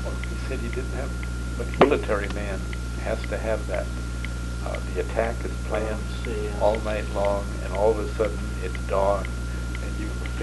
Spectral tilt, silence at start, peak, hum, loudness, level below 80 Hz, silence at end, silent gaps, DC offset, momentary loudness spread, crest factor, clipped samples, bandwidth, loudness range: -6 dB/octave; 0 s; 0 dBFS; 60 Hz at -35 dBFS; -27 LUFS; -30 dBFS; 0 s; none; under 0.1%; 8 LU; 26 dB; under 0.1%; 12 kHz; 3 LU